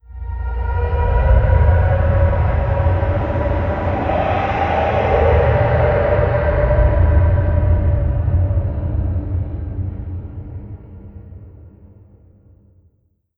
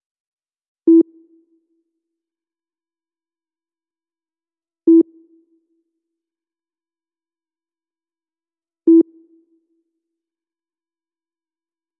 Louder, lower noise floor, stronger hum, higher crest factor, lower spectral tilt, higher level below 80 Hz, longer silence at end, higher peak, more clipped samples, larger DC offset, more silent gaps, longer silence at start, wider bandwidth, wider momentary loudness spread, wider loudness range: about the same, -17 LUFS vs -15 LUFS; second, -61 dBFS vs under -90 dBFS; neither; about the same, 14 dB vs 18 dB; first, -10 dB/octave vs -2.5 dB/octave; first, -20 dBFS vs under -90 dBFS; second, 1.7 s vs 2.95 s; about the same, -2 dBFS vs -4 dBFS; neither; neither; neither; second, 0.1 s vs 0.85 s; first, 4.3 kHz vs 1.1 kHz; first, 15 LU vs 10 LU; first, 14 LU vs 0 LU